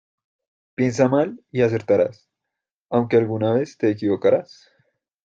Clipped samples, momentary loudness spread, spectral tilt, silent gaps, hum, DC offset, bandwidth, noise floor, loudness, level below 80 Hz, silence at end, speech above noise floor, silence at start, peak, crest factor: under 0.1%; 6 LU; -7.5 dB/octave; 2.75-2.89 s; none; under 0.1%; 8 kHz; -84 dBFS; -21 LUFS; -62 dBFS; 0.8 s; 64 dB; 0.8 s; -4 dBFS; 18 dB